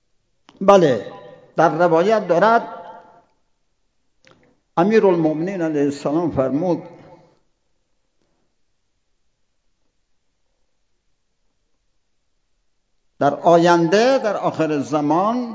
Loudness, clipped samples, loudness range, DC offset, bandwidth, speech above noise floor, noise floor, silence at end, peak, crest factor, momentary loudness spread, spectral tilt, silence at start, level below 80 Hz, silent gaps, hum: -17 LUFS; under 0.1%; 9 LU; under 0.1%; 7.8 kHz; 54 dB; -70 dBFS; 0 s; 0 dBFS; 20 dB; 9 LU; -6.5 dB/octave; 0.6 s; -60 dBFS; none; none